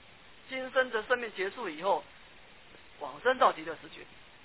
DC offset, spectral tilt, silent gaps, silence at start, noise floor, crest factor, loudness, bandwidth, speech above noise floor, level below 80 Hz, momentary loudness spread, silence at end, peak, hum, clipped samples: 0.1%; -0.5 dB/octave; none; 0.45 s; -56 dBFS; 22 dB; -31 LUFS; 4 kHz; 24 dB; -68 dBFS; 20 LU; 0.25 s; -12 dBFS; none; under 0.1%